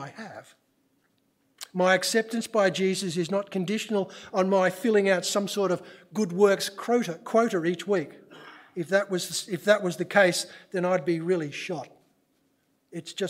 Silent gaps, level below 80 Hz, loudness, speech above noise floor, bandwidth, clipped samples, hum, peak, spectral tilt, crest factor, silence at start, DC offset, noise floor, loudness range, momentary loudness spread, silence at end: none; -80 dBFS; -26 LUFS; 44 dB; 16 kHz; under 0.1%; none; -6 dBFS; -4.5 dB/octave; 20 dB; 0 s; under 0.1%; -70 dBFS; 2 LU; 14 LU; 0 s